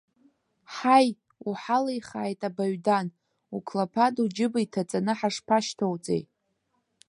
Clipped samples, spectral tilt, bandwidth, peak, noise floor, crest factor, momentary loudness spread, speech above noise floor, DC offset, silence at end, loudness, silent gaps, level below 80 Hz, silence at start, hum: under 0.1%; -5.5 dB/octave; 11.5 kHz; -6 dBFS; -75 dBFS; 22 dB; 13 LU; 49 dB; under 0.1%; 0.85 s; -27 LUFS; none; -74 dBFS; 0.7 s; none